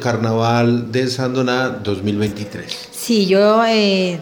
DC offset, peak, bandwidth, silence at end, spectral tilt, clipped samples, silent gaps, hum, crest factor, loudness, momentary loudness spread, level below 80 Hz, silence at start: under 0.1%; -2 dBFS; over 20 kHz; 0 s; -5.5 dB/octave; under 0.1%; none; none; 14 dB; -16 LUFS; 13 LU; -54 dBFS; 0 s